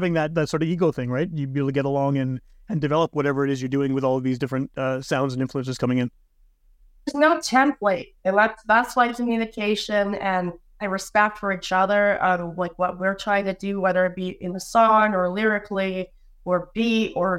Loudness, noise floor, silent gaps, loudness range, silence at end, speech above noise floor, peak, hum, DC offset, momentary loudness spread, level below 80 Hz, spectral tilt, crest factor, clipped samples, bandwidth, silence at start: -23 LUFS; -57 dBFS; none; 3 LU; 0 s; 35 dB; -4 dBFS; none; under 0.1%; 9 LU; -52 dBFS; -6 dB/octave; 18 dB; under 0.1%; 16 kHz; 0 s